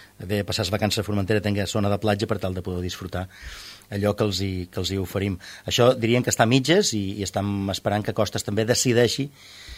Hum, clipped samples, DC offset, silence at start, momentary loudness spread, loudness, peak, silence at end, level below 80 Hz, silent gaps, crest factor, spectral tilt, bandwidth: none; under 0.1%; under 0.1%; 0 s; 13 LU; -24 LUFS; -2 dBFS; 0 s; -50 dBFS; none; 20 dB; -4.5 dB/octave; 16 kHz